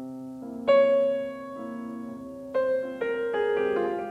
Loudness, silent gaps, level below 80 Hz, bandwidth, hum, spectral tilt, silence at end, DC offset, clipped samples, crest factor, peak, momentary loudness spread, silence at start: -26 LUFS; none; -66 dBFS; 7.8 kHz; none; -6 dB/octave; 0 s; under 0.1%; under 0.1%; 16 dB; -10 dBFS; 17 LU; 0 s